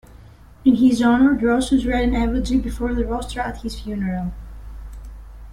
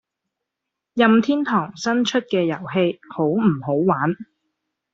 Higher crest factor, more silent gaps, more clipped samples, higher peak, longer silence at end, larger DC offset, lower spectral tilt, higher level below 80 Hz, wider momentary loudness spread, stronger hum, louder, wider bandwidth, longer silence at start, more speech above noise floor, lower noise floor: about the same, 16 dB vs 20 dB; neither; neither; second, -4 dBFS vs 0 dBFS; second, 0 s vs 0.7 s; neither; about the same, -6 dB/octave vs -5 dB/octave; first, -32 dBFS vs -64 dBFS; first, 23 LU vs 8 LU; neither; about the same, -20 LUFS vs -20 LUFS; first, 12 kHz vs 7.8 kHz; second, 0.15 s vs 0.95 s; second, 25 dB vs 63 dB; second, -44 dBFS vs -83 dBFS